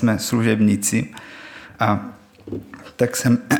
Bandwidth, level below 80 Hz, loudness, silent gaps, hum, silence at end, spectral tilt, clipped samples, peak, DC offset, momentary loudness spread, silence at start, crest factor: 20 kHz; -58 dBFS; -20 LUFS; none; none; 0 s; -5 dB/octave; under 0.1%; -2 dBFS; under 0.1%; 20 LU; 0 s; 18 dB